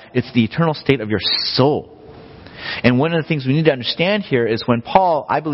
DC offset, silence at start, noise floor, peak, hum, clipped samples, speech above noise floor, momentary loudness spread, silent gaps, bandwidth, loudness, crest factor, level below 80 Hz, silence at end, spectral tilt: under 0.1%; 0 s; -39 dBFS; 0 dBFS; none; under 0.1%; 22 dB; 4 LU; none; 6 kHz; -17 LUFS; 18 dB; -48 dBFS; 0 s; -9 dB/octave